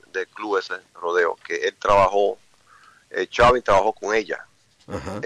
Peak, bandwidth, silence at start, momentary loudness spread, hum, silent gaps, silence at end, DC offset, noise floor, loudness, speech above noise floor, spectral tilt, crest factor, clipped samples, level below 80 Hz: -8 dBFS; 11 kHz; 0.15 s; 16 LU; none; none; 0 s; under 0.1%; -53 dBFS; -21 LUFS; 32 dB; -4.5 dB/octave; 14 dB; under 0.1%; -44 dBFS